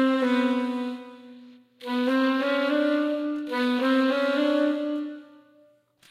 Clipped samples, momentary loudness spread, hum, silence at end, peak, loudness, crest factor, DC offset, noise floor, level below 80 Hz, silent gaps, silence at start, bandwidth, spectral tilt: under 0.1%; 13 LU; none; 0.85 s; -12 dBFS; -25 LUFS; 14 dB; under 0.1%; -60 dBFS; -90 dBFS; none; 0 s; 13.5 kHz; -4 dB/octave